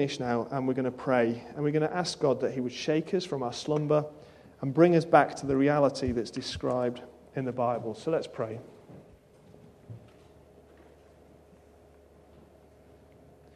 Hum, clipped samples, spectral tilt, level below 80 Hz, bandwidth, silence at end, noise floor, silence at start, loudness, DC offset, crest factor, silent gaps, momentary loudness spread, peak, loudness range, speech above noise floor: none; under 0.1%; -6 dB/octave; -58 dBFS; 11.5 kHz; 3.6 s; -57 dBFS; 0 s; -28 LUFS; under 0.1%; 24 dB; none; 14 LU; -6 dBFS; 10 LU; 29 dB